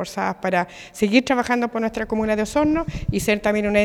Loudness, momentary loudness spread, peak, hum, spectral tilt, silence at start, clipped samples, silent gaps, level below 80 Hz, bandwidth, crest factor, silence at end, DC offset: -21 LUFS; 6 LU; -2 dBFS; none; -5.5 dB/octave; 0 s; under 0.1%; none; -40 dBFS; 17 kHz; 18 dB; 0 s; under 0.1%